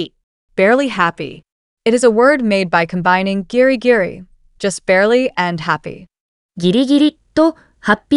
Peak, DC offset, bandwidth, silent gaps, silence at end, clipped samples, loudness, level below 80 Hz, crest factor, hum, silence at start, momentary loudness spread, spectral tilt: 0 dBFS; under 0.1%; 11.5 kHz; 0.23-0.48 s, 1.52-1.77 s, 6.20-6.49 s; 0 s; under 0.1%; -15 LUFS; -50 dBFS; 14 dB; none; 0 s; 11 LU; -5 dB/octave